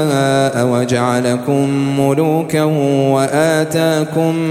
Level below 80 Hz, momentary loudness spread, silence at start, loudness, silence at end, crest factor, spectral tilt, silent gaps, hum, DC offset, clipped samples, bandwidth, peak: -54 dBFS; 2 LU; 0 s; -14 LUFS; 0 s; 14 dB; -6 dB/octave; none; none; under 0.1%; under 0.1%; 16 kHz; 0 dBFS